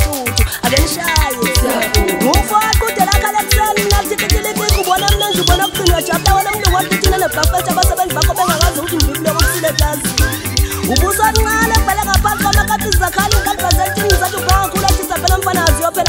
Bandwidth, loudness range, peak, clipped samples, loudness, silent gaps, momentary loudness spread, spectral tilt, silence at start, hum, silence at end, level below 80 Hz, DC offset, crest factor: 16.5 kHz; 1 LU; 0 dBFS; under 0.1%; -13 LUFS; none; 3 LU; -3.5 dB/octave; 0 s; none; 0 s; -20 dBFS; under 0.1%; 14 dB